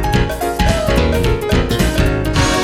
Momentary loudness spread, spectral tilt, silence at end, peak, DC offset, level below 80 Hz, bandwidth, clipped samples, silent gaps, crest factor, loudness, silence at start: 2 LU; -5 dB/octave; 0 s; 0 dBFS; under 0.1%; -20 dBFS; 16.5 kHz; under 0.1%; none; 14 dB; -16 LUFS; 0 s